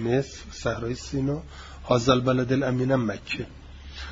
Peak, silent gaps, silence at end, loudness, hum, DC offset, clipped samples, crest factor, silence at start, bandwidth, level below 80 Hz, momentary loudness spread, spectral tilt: -6 dBFS; none; 0 s; -26 LUFS; none; under 0.1%; under 0.1%; 20 dB; 0 s; 7.8 kHz; -44 dBFS; 19 LU; -6 dB/octave